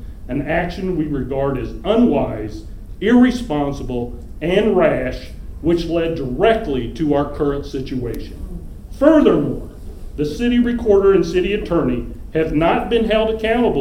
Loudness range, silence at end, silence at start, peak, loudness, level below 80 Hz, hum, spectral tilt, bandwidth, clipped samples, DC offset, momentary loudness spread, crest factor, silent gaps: 3 LU; 0 s; 0 s; 0 dBFS; -18 LUFS; -32 dBFS; none; -7 dB/octave; 15 kHz; under 0.1%; under 0.1%; 17 LU; 18 dB; none